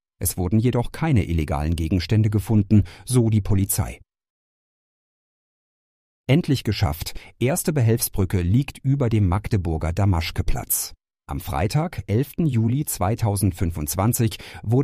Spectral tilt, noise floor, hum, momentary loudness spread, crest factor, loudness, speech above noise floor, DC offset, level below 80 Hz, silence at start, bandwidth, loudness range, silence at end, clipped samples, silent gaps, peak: -6 dB/octave; under -90 dBFS; none; 6 LU; 16 dB; -22 LUFS; over 69 dB; under 0.1%; -36 dBFS; 0.2 s; 15.5 kHz; 6 LU; 0 s; under 0.1%; 4.30-6.24 s; -6 dBFS